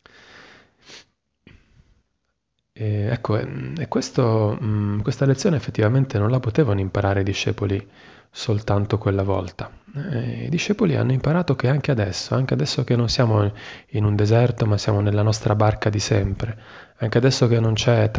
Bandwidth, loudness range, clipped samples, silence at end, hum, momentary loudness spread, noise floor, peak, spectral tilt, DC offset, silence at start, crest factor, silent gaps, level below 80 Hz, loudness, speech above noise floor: 8 kHz; 5 LU; under 0.1%; 0 s; none; 10 LU; -75 dBFS; -4 dBFS; -6.5 dB/octave; under 0.1%; 0.4 s; 18 dB; none; -42 dBFS; -21 LUFS; 54 dB